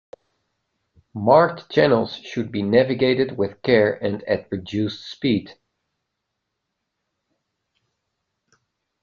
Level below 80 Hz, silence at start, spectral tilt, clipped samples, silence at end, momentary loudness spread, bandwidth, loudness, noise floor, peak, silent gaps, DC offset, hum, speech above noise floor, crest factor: -60 dBFS; 1.15 s; -7 dB/octave; under 0.1%; 3.5 s; 11 LU; 7 kHz; -21 LUFS; -79 dBFS; -2 dBFS; none; under 0.1%; none; 59 dB; 22 dB